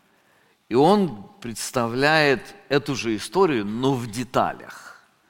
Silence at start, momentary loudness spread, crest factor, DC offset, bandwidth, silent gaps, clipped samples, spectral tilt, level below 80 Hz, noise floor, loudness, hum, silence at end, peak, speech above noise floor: 0.7 s; 16 LU; 20 dB; under 0.1%; 17 kHz; none; under 0.1%; -5 dB/octave; -54 dBFS; -61 dBFS; -22 LUFS; none; 0.35 s; -2 dBFS; 39 dB